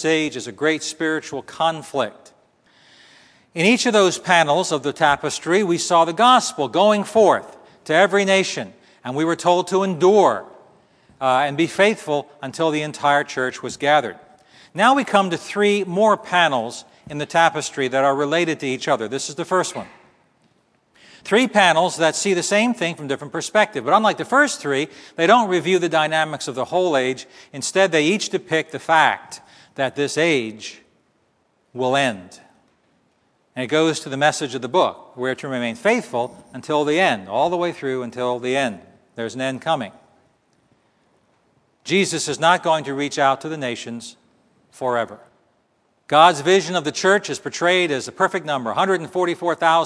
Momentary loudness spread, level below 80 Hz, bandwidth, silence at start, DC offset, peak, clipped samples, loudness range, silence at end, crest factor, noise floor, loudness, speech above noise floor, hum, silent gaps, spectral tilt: 13 LU; -66 dBFS; 11 kHz; 0 s; under 0.1%; 0 dBFS; under 0.1%; 7 LU; 0 s; 20 dB; -64 dBFS; -19 LUFS; 45 dB; none; none; -3.5 dB/octave